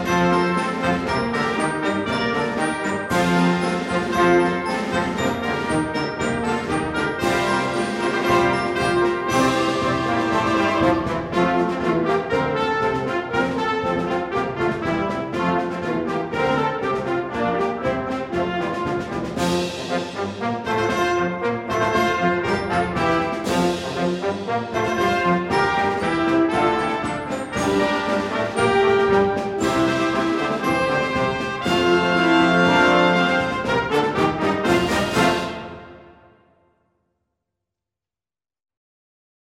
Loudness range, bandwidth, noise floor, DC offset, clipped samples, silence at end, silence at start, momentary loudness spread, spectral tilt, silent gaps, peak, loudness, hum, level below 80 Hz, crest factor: 5 LU; 15 kHz; under -90 dBFS; under 0.1%; under 0.1%; 3.4 s; 0 s; 7 LU; -5.5 dB/octave; none; -2 dBFS; -21 LUFS; none; -46 dBFS; 20 dB